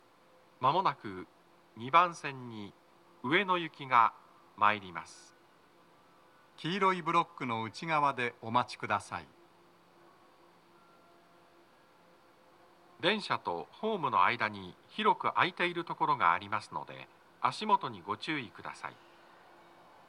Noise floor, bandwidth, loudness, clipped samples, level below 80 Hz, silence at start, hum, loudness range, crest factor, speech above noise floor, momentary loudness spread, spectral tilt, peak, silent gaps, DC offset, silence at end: -63 dBFS; 11.5 kHz; -32 LUFS; under 0.1%; -82 dBFS; 0.6 s; none; 8 LU; 24 dB; 31 dB; 17 LU; -5 dB/octave; -10 dBFS; none; under 0.1%; 1.15 s